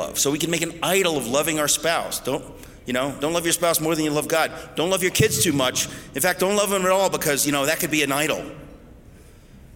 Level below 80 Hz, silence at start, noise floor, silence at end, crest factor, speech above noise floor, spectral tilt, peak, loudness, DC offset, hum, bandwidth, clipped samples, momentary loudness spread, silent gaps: -50 dBFS; 0 s; -46 dBFS; 0 s; 16 dB; 24 dB; -3 dB/octave; -6 dBFS; -21 LUFS; under 0.1%; none; 17 kHz; under 0.1%; 7 LU; none